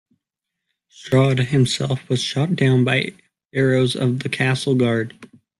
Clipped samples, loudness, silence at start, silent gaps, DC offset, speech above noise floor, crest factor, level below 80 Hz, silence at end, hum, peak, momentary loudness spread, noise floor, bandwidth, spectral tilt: under 0.1%; -19 LUFS; 1 s; 3.45-3.49 s; under 0.1%; 63 dB; 16 dB; -56 dBFS; 0.35 s; none; -4 dBFS; 7 LU; -82 dBFS; 12 kHz; -6 dB/octave